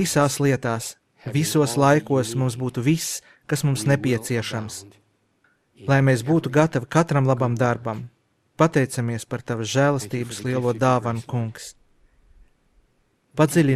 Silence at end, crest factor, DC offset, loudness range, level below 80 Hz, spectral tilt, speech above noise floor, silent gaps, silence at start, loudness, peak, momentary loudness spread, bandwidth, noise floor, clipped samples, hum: 0 s; 18 dB; under 0.1%; 4 LU; -58 dBFS; -5.5 dB/octave; 44 dB; none; 0 s; -22 LUFS; -4 dBFS; 13 LU; 15.5 kHz; -65 dBFS; under 0.1%; none